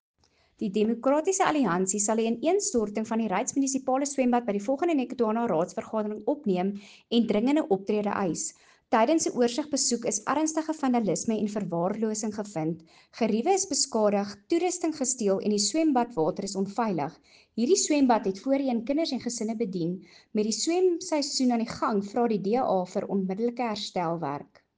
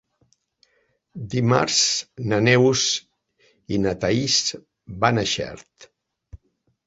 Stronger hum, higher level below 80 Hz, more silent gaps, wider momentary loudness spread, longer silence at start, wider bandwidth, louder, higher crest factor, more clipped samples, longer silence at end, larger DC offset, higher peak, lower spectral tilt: neither; second, -66 dBFS vs -52 dBFS; neither; second, 7 LU vs 20 LU; second, 0.6 s vs 1.15 s; first, 10 kHz vs 8 kHz; second, -27 LUFS vs -20 LUFS; about the same, 18 dB vs 22 dB; neither; second, 0.35 s vs 0.5 s; neither; second, -8 dBFS vs -2 dBFS; about the same, -4 dB/octave vs -3.5 dB/octave